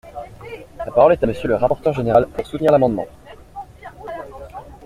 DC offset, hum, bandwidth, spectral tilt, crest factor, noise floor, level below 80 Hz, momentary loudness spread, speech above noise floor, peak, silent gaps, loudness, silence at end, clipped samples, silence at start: under 0.1%; none; 13.5 kHz; -8 dB/octave; 18 dB; -37 dBFS; -42 dBFS; 22 LU; 20 dB; -2 dBFS; none; -17 LUFS; 0 s; under 0.1%; 0.05 s